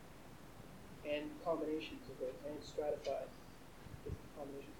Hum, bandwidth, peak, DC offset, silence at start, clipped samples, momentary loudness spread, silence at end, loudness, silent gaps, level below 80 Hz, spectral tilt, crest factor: none; 19 kHz; -26 dBFS; under 0.1%; 0 s; under 0.1%; 16 LU; 0 s; -45 LUFS; none; -62 dBFS; -5.5 dB/octave; 18 dB